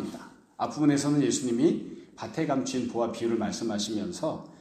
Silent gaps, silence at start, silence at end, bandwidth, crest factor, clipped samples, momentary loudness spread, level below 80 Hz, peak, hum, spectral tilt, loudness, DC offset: none; 0 s; 0.05 s; 13.5 kHz; 18 dB; under 0.1%; 14 LU; -66 dBFS; -12 dBFS; none; -5 dB/octave; -28 LUFS; under 0.1%